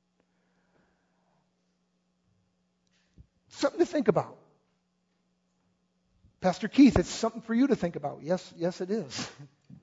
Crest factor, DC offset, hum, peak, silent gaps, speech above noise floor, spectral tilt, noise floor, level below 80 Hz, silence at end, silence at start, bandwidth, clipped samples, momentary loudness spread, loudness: 24 dB; under 0.1%; none; -8 dBFS; none; 48 dB; -6 dB/octave; -75 dBFS; -52 dBFS; 0.1 s; 3.55 s; 8 kHz; under 0.1%; 15 LU; -28 LUFS